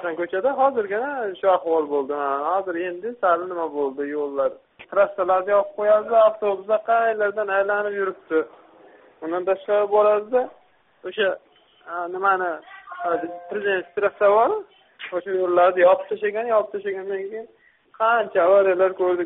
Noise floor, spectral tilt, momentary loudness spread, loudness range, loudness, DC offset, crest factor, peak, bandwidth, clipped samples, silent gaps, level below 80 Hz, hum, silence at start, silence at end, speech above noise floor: -50 dBFS; -2.5 dB/octave; 12 LU; 4 LU; -22 LUFS; under 0.1%; 16 dB; -6 dBFS; 4 kHz; under 0.1%; none; -70 dBFS; none; 0 s; 0 s; 29 dB